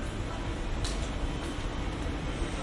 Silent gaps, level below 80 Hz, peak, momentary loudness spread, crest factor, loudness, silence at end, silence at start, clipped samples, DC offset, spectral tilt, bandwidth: none; -36 dBFS; -18 dBFS; 2 LU; 14 dB; -35 LUFS; 0 s; 0 s; under 0.1%; under 0.1%; -5 dB/octave; 11.5 kHz